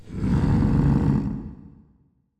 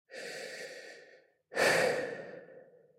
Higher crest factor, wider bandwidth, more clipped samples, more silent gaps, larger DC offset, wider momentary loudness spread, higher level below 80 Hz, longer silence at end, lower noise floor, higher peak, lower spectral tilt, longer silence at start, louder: second, 14 dB vs 22 dB; second, 8.6 kHz vs 16 kHz; neither; neither; neither; second, 13 LU vs 24 LU; first, -32 dBFS vs -84 dBFS; first, 0.85 s vs 0.35 s; about the same, -62 dBFS vs -61 dBFS; first, -10 dBFS vs -14 dBFS; first, -9.5 dB/octave vs -2.5 dB/octave; about the same, 0.05 s vs 0.1 s; first, -22 LUFS vs -32 LUFS